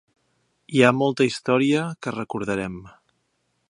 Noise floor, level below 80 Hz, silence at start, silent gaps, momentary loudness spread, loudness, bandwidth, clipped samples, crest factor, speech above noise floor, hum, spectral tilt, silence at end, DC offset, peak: -72 dBFS; -58 dBFS; 0.7 s; none; 12 LU; -22 LUFS; 11 kHz; under 0.1%; 24 dB; 50 dB; none; -5.5 dB/octave; 0.8 s; under 0.1%; 0 dBFS